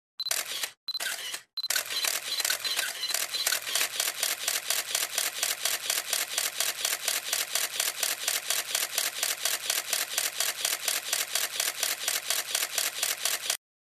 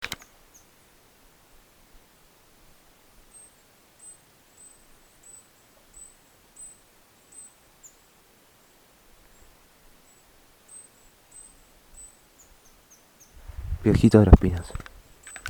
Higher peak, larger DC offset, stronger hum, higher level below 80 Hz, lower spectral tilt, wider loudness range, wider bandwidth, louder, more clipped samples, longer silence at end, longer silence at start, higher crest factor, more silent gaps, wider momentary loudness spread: second, -8 dBFS vs 0 dBFS; neither; neither; second, -78 dBFS vs -34 dBFS; second, 3 dB/octave vs -7.5 dB/octave; second, 1 LU vs 29 LU; second, 15 kHz vs 20 kHz; second, -28 LUFS vs -20 LUFS; neither; first, 0.4 s vs 0 s; first, 0.2 s vs 0 s; second, 22 dB vs 28 dB; first, 0.77-0.87 s, 1.53-1.57 s vs none; second, 3 LU vs 32 LU